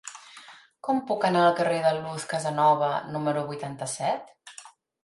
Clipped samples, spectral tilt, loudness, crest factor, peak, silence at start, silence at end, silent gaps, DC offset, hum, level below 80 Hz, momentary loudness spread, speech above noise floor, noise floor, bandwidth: under 0.1%; -5 dB/octave; -26 LUFS; 20 dB; -8 dBFS; 0.05 s; 0.35 s; none; under 0.1%; none; -72 dBFS; 23 LU; 25 dB; -50 dBFS; 11.5 kHz